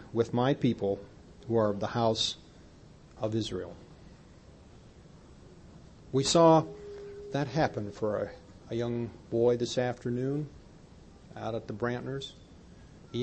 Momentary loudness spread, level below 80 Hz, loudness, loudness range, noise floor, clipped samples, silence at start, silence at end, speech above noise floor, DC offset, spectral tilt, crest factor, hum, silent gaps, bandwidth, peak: 18 LU; -58 dBFS; -30 LUFS; 9 LU; -54 dBFS; under 0.1%; 0 s; 0 s; 25 dB; under 0.1%; -5.5 dB/octave; 22 dB; none; none; 8.8 kHz; -10 dBFS